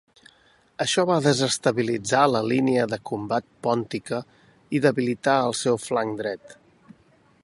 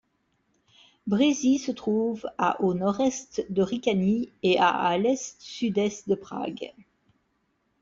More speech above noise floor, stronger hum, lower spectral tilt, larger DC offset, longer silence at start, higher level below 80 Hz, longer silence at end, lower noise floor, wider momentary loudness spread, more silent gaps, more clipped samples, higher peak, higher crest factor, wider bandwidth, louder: second, 36 dB vs 47 dB; neither; about the same, -4.5 dB/octave vs -5 dB/octave; neither; second, 0.8 s vs 1.05 s; about the same, -64 dBFS vs -64 dBFS; second, 0.9 s vs 1.1 s; second, -59 dBFS vs -73 dBFS; about the same, 10 LU vs 11 LU; neither; neither; first, -4 dBFS vs -10 dBFS; about the same, 20 dB vs 18 dB; first, 11.5 kHz vs 7.8 kHz; first, -23 LUFS vs -26 LUFS